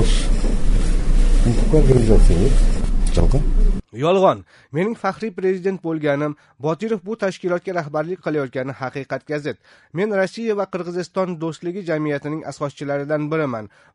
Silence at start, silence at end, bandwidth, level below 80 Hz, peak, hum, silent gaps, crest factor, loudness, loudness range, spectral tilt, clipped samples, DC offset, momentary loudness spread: 0 s; 0.25 s; 11 kHz; -20 dBFS; 0 dBFS; none; none; 16 dB; -22 LUFS; 6 LU; -6.5 dB/octave; under 0.1%; under 0.1%; 11 LU